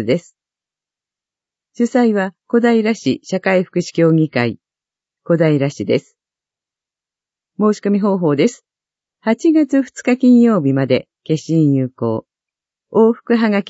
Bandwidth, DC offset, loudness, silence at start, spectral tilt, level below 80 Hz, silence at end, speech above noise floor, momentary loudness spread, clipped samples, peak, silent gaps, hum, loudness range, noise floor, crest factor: 8 kHz; under 0.1%; -16 LUFS; 0 s; -7 dB/octave; -64 dBFS; 0.1 s; 74 dB; 8 LU; under 0.1%; -2 dBFS; none; none; 5 LU; -89 dBFS; 16 dB